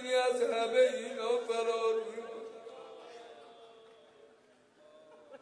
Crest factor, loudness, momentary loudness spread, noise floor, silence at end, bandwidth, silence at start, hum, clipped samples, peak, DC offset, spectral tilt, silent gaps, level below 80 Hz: 18 dB; -32 LUFS; 24 LU; -64 dBFS; 0.05 s; 10.5 kHz; 0 s; none; under 0.1%; -16 dBFS; under 0.1%; -2 dB/octave; none; under -90 dBFS